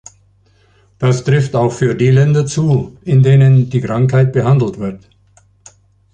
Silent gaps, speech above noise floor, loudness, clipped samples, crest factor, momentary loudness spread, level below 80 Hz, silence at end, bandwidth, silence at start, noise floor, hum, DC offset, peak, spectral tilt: none; 40 dB; -13 LUFS; under 0.1%; 12 dB; 8 LU; -46 dBFS; 1.15 s; 9 kHz; 1 s; -52 dBFS; none; under 0.1%; 0 dBFS; -7.5 dB/octave